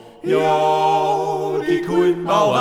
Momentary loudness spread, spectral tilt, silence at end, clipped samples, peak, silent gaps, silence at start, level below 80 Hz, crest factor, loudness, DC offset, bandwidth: 5 LU; -5.5 dB/octave; 0 s; under 0.1%; -4 dBFS; none; 0.05 s; -56 dBFS; 14 dB; -18 LUFS; under 0.1%; 15 kHz